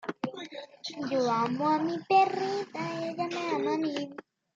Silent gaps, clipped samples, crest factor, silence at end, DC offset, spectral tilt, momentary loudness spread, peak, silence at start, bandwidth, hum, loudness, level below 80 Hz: none; under 0.1%; 18 dB; 0.35 s; under 0.1%; -5.5 dB/octave; 16 LU; -12 dBFS; 0.05 s; 7.8 kHz; none; -30 LUFS; -78 dBFS